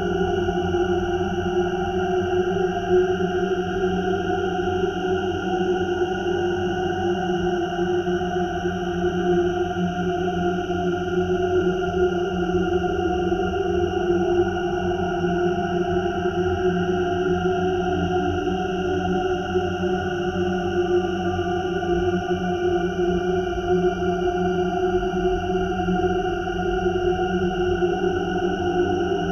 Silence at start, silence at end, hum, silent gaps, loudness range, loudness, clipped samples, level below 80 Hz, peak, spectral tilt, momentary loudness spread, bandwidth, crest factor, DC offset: 0 s; 0 s; none; none; 1 LU; -23 LUFS; under 0.1%; -40 dBFS; -8 dBFS; -7 dB/octave; 3 LU; 6.8 kHz; 14 dB; under 0.1%